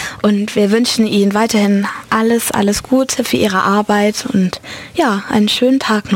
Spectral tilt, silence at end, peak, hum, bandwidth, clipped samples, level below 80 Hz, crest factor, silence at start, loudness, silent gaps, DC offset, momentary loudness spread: -4.5 dB/octave; 0 s; -2 dBFS; none; 17 kHz; under 0.1%; -46 dBFS; 12 dB; 0 s; -14 LUFS; none; under 0.1%; 4 LU